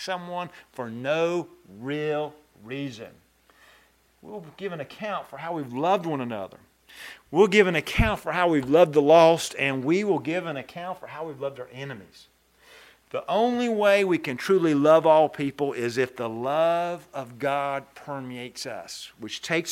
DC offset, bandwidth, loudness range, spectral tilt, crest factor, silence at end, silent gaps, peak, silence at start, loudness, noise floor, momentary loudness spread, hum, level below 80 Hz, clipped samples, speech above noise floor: under 0.1%; 16 kHz; 13 LU; -5.5 dB/octave; 22 dB; 0 s; none; -4 dBFS; 0 s; -24 LUFS; -60 dBFS; 19 LU; none; -48 dBFS; under 0.1%; 36 dB